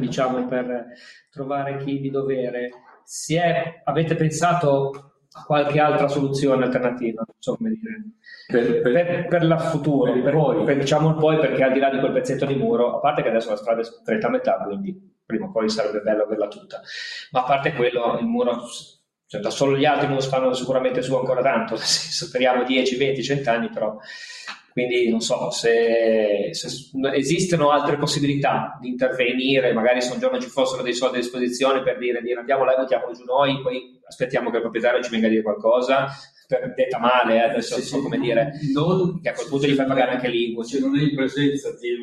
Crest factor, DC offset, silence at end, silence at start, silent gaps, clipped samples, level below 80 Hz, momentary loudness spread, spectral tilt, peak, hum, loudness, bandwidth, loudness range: 18 dB; under 0.1%; 0 s; 0 s; none; under 0.1%; -62 dBFS; 10 LU; -5 dB/octave; -4 dBFS; none; -21 LUFS; 12.5 kHz; 4 LU